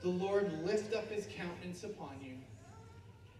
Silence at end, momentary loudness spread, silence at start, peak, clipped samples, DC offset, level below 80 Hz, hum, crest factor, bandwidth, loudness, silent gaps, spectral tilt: 0 s; 21 LU; 0 s; -22 dBFS; under 0.1%; under 0.1%; -68 dBFS; none; 18 dB; 12.5 kHz; -39 LUFS; none; -6 dB/octave